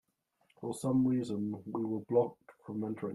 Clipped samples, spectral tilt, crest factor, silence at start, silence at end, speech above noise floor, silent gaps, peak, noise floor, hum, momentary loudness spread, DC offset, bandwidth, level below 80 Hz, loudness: under 0.1%; -8 dB/octave; 18 dB; 0.6 s; 0 s; 41 dB; none; -16 dBFS; -75 dBFS; none; 13 LU; under 0.1%; 12.5 kHz; -72 dBFS; -34 LUFS